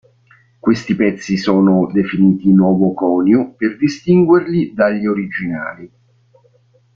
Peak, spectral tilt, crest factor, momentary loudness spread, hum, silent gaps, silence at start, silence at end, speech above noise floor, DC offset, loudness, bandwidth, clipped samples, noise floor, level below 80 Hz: -2 dBFS; -8 dB/octave; 14 dB; 9 LU; none; none; 0.65 s; 1.1 s; 40 dB; under 0.1%; -15 LUFS; 7.2 kHz; under 0.1%; -53 dBFS; -52 dBFS